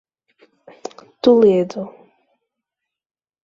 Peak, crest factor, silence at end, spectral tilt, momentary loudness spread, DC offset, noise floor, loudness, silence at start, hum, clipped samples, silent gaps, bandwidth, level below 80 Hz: -2 dBFS; 18 dB; 1.55 s; -7 dB/octave; 23 LU; under 0.1%; -83 dBFS; -15 LUFS; 1.25 s; none; under 0.1%; none; 7.6 kHz; -62 dBFS